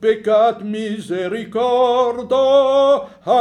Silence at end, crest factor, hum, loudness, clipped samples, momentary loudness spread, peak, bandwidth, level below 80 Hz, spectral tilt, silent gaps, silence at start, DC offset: 0 s; 12 dB; none; -17 LUFS; under 0.1%; 10 LU; -4 dBFS; 10.5 kHz; -60 dBFS; -5.5 dB/octave; none; 0 s; under 0.1%